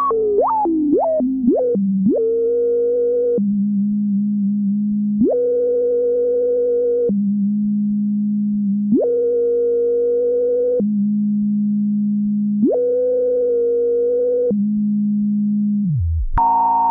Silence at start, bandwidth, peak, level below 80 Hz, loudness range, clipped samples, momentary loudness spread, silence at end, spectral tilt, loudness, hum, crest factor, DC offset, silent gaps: 0 s; 1.9 kHz; -6 dBFS; -38 dBFS; 1 LU; under 0.1%; 2 LU; 0 s; -15 dB/octave; -18 LUFS; none; 12 dB; under 0.1%; none